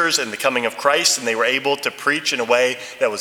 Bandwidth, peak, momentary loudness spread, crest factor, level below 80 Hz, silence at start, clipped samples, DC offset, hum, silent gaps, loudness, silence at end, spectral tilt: 19 kHz; 0 dBFS; 5 LU; 18 dB; -72 dBFS; 0 s; under 0.1%; under 0.1%; none; none; -18 LUFS; 0 s; -1 dB/octave